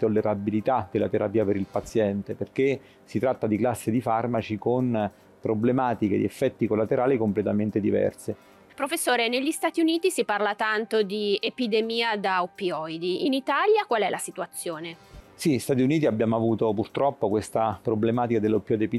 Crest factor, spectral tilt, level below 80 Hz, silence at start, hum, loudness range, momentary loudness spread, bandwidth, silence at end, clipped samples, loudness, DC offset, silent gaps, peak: 12 dB; -5.5 dB/octave; -62 dBFS; 0 s; none; 2 LU; 7 LU; 14.5 kHz; 0 s; under 0.1%; -25 LUFS; under 0.1%; none; -12 dBFS